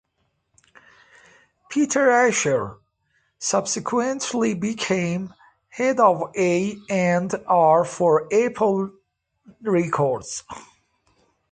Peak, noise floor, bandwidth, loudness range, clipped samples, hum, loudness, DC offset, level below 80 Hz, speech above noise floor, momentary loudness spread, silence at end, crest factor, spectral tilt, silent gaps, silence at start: -4 dBFS; -72 dBFS; 9.6 kHz; 4 LU; under 0.1%; none; -21 LUFS; under 0.1%; -62 dBFS; 51 dB; 14 LU; 0.9 s; 18 dB; -4.5 dB/octave; none; 1.7 s